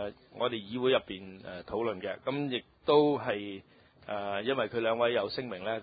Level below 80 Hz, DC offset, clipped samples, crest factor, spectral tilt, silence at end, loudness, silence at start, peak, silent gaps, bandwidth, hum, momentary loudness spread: -66 dBFS; under 0.1%; under 0.1%; 20 dB; -9 dB/octave; 0 s; -31 LUFS; 0 s; -12 dBFS; none; 5 kHz; none; 16 LU